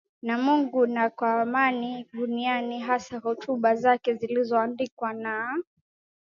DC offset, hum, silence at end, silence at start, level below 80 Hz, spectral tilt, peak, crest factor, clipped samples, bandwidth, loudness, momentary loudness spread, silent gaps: under 0.1%; none; 0.75 s; 0.25 s; -74 dBFS; -5.5 dB/octave; -8 dBFS; 20 dB; under 0.1%; 7.4 kHz; -26 LUFS; 9 LU; 4.92-4.97 s